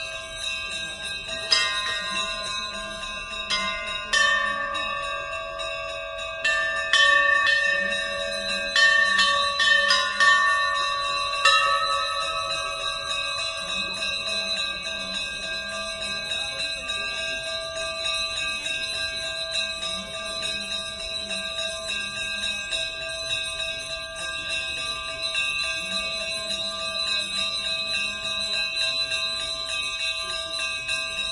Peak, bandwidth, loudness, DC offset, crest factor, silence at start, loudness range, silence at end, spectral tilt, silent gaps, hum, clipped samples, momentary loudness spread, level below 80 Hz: -4 dBFS; 11.5 kHz; -24 LUFS; under 0.1%; 22 dB; 0 s; 8 LU; 0 s; 0 dB/octave; none; none; under 0.1%; 11 LU; -52 dBFS